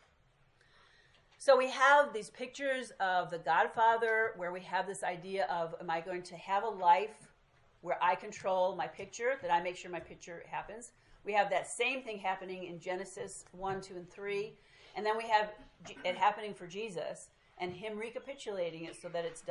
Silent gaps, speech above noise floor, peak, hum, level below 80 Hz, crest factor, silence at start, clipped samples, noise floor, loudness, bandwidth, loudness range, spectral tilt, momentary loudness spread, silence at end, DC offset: none; 34 dB; -14 dBFS; none; -72 dBFS; 22 dB; 1.4 s; under 0.1%; -69 dBFS; -34 LUFS; 11.5 kHz; 7 LU; -3.5 dB/octave; 16 LU; 0 s; under 0.1%